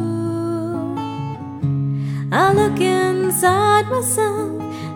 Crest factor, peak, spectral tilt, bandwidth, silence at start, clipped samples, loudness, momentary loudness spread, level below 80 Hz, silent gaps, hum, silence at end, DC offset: 16 dB; -4 dBFS; -5 dB/octave; 19 kHz; 0 s; under 0.1%; -19 LUFS; 11 LU; -56 dBFS; none; none; 0 s; under 0.1%